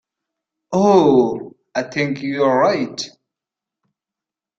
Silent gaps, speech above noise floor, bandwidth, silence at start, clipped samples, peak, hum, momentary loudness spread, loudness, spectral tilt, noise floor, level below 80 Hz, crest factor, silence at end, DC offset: none; 71 dB; 7.8 kHz; 0.7 s; under 0.1%; -2 dBFS; none; 15 LU; -17 LUFS; -6 dB/octave; -87 dBFS; -60 dBFS; 18 dB; 1.5 s; under 0.1%